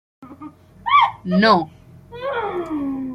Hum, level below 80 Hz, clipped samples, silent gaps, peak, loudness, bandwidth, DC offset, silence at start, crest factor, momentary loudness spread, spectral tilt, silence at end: none; -54 dBFS; under 0.1%; none; -2 dBFS; -18 LUFS; 10 kHz; under 0.1%; 0.2 s; 18 dB; 24 LU; -7 dB/octave; 0 s